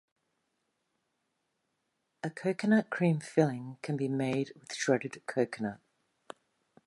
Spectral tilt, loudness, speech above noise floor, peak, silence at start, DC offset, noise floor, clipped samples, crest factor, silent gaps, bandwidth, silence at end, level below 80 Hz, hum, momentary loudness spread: -6 dB/octave; -32 LUFS; 50 dB; -12 dBFS; 2.25 s; under 0.1%; -81 dBFS; under 0.1%; 22 dB; none; 11.5 kHz; 1.1 s; -78 dBFS; none; 13 LU